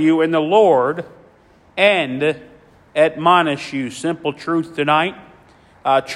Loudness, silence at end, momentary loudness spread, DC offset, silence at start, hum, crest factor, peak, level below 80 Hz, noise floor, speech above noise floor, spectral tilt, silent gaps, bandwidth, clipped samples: -17 LUFS; 0 s; 12 LU; under 0.1%; 0 s; none; 18 dB; 0 dBFS; -60 dBFS; -50 dBFS; 34 dB; -5.5 dB/octave; none; 12 kHz; under 0.1%